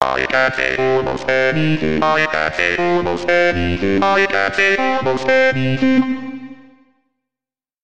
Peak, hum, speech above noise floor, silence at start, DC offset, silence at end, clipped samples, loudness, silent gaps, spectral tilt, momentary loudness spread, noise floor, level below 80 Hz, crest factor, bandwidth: 0 dBFS; none; 73 dB; 0 s; 2%; 0 s; under 0.1%; -16 LUFS; none; -5.5 dB/octave; 4 LU; -89 dBFS; -44 dBFS; 16 dB; 9 kHz